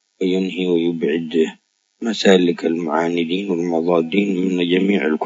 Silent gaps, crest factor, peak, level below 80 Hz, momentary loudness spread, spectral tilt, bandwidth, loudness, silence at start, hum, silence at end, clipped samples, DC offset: none; 18 dB; 0 dBFS; -72 dBFS; 6 LU; -6 dB/octave; 7.8 kHz; -18 LUFS; 0.2 s; none; 0 s; under 0.1%; under 0.1%